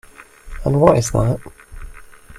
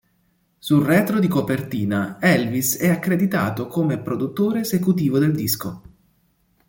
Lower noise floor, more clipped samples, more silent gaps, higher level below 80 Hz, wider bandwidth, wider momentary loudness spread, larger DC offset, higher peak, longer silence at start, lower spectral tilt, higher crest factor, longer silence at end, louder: second, -39 dBFS vs -64 dBFS; neither; neither; first, -34 dBFS vs -56 dBFS; second, 15 kHz vs 17 kHz; first, 13 LU vs 6 LU; neither; first, 0 dBFS vs -4 dBFS; second, 0.2 s vs 0.65 s; about the same, -6.5 dB/octave vs -5.5 dB/octave; about the same, 20 dB vs 18 dB; second, 0 s vs 0.9 s; first, -17 LUFS vs -20 LUFS